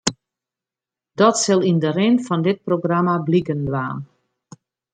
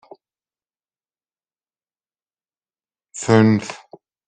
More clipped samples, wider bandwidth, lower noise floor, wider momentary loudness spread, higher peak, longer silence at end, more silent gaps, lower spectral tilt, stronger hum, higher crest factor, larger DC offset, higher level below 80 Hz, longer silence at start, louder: neither; about the same, 9.4 kHz vs 9.4 kHz; about the same, -89 dBFS vs under -90 dBFS; second, 9 LU vs 23 LU; about the same, -2 dBFS vs -2 dBFS; first, 0.9 s vs 0.5 s; neither; about the same, -5.5 dB/octave vs -6.5 dB/octave; neither; about the same, 18 dB vs 20 dB; neither; first, -56 dBFS vs -62 dBFS; second, 0.05 s vs 3.15 s; about the same, -19 LUFS vs -17 LUFS